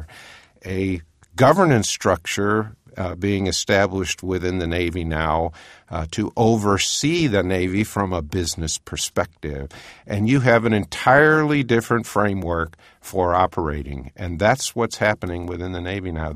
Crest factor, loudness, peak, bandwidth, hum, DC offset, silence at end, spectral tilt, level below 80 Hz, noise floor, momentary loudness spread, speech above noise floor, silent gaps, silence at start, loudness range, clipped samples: 20 dB; -21 LUFS; 0 dBFS; 15.5 kHz; none; under 0.1%; 0 s; -5 dB/octave; -40 dBFS; -45 dBFS; 14 LU; 25 dB; none; 0 s; 4 LU; under 0.1%